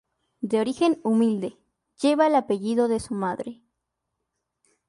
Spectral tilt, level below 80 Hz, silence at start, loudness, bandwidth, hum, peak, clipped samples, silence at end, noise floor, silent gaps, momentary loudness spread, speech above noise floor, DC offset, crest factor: -6 dB/octave; -62 dBFS; 0.4 s; -24 LUFS; 11.5 kHz; none; -8 dBFS; under 0.1%; 1.35 s; -81 dBFS; none; 13 LU; 58 dB; under 0.1%; 16 dB